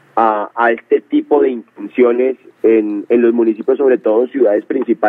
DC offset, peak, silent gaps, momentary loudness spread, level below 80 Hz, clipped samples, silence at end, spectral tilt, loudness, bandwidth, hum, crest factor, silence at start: under 0.1%; 0 dBFS; none; 5 LU; -66 dBFS; under 0.1%; 0 s; -8.5 dB/octave; -14 LUFS; 3.8 kHz; none; 14 dB; 0.15 s